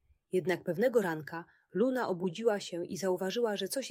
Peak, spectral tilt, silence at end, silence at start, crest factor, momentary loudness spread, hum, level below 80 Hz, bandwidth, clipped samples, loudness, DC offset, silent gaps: -16 dBFS; -5 dB/octave; 0 s; 0.35 s; 16 dB; 10 LU; none; -78 dBFS; 16 kHz; under 0.1%; -33 LUFS; under 0.1%; none